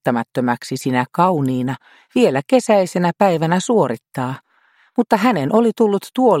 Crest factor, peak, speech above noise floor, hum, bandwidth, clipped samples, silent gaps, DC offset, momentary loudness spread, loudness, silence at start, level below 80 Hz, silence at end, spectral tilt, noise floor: 16 dB; 0 dBFS; 40 dB; none; 16 kHz; under 0.1%; none; under 0.1%; 10 LU; -17 LUFS; 0.05 s; -64 dBFS; 0 s; -6 dB/octave; -57 dBFS